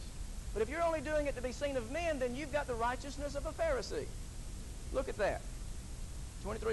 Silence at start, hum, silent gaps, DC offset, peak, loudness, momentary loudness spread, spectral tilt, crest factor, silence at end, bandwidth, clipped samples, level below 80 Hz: 0 s; none; none; under 0.1%; -22 dBFS; -39 LUFS; 13 LU; -5 dB/octave; 16 dB; 0 s; 12 kHz; under 0.1%; -44 dBFS